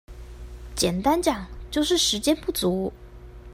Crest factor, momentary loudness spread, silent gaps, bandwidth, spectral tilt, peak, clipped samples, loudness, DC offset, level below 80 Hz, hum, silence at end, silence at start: 18 dB; 22 LU; none; 16 kHz; -3.5 dB/octave; -8 dBFS; under 0.1%; -24 LUFS; under 0.1%; -42 dBFS; none; 0 s; 0.1 s